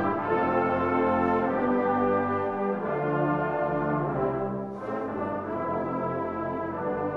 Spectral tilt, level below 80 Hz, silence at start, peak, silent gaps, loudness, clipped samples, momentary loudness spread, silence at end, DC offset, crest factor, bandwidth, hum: -9.5 dB/octave; -56 dBFS; 0 s; -14 dBFS; none; -27 LUFS; under 0.1%; 6 LU; 0 s; under 0.1%; 14 dB; 6 kHz; none